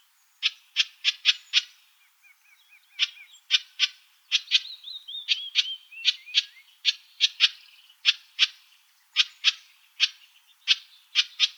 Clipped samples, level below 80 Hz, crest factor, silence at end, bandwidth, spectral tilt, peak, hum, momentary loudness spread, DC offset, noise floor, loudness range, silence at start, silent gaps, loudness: under 0.1%; under -90 dBFS; 24 dB; 0.05 s; over 20 kHz; 13 dB/octave; -4 dBFS; none; 10 LU; under 0.1%; -61 dBFS; 3 LU; 0.4 s; none; -25 LUFS